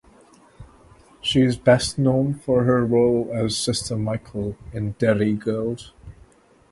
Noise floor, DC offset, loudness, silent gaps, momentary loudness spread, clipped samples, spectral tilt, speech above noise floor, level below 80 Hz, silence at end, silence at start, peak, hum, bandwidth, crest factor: -53 dBFS; under 0.1%; -21 LUFS; none; 12 LU; under 0.1%; -5.5 dB/octave; 33 dB; -46 dBFS; 0.6 s; 0.6 s; -4 dBFS; none; 11.5 kHz; 18 dB